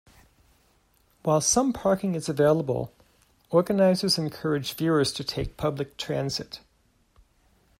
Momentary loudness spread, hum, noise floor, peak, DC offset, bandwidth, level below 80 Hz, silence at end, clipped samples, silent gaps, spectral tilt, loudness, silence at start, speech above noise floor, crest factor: 11 LU; none; -66 dBFS; -8 dBFS; under 0.1%; 16 kHz; -52 dBFS; 1.2 s; under 0.1%; none; -4.5 dB/octave; -25 LUFS; 1.25 s; 41 dB; 18 dB